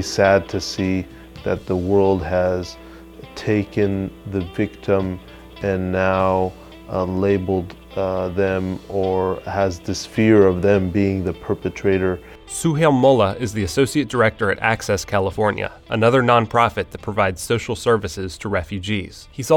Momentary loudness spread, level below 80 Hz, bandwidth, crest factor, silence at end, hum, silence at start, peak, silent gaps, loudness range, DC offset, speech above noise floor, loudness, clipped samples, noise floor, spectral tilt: 12 LU; -44 dBFS; 17.5 kHz; 18 dB; 0 s; none; 0 s; 0 dBFS; none; 4 LU; under 0.1%; 20 dB; -20 LUFS; under 0.1%; -39 dBFS; -6 dB/octave